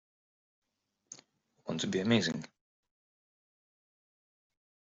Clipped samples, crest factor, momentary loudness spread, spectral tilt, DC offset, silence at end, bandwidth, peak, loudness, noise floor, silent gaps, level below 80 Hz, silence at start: under 0.1%; 26 dB; 23 LU; -4.5 dB/octave; under 0.1%; 2.35 s; 7.8 kHz; -14 dBFS; -32 LUFS; -66 dBFS; none; -74 dBFS; 1.1 s